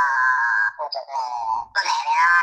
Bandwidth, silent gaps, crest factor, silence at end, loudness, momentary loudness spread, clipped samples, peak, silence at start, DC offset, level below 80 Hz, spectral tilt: 9.6 kHz; none; 14 dB; 0 s; -21 LUFS; 10 LU; under 0.1%; -6 dBFS; 0 s; under 0.1%; -66 dBFS; 2 dB/octave